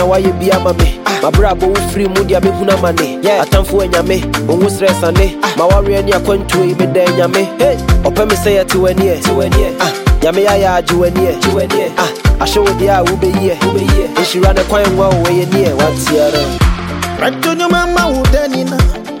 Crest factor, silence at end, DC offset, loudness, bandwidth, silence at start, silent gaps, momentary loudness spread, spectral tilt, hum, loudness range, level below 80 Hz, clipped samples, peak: 10 dB; 0 s; under 0.1%; -12 LUFS; 17 kHz; 0 s; none; 3 LU; -5.5 dB/octave; none; 1 LU; -20 dBFS; under 0.1%; 0 dBFS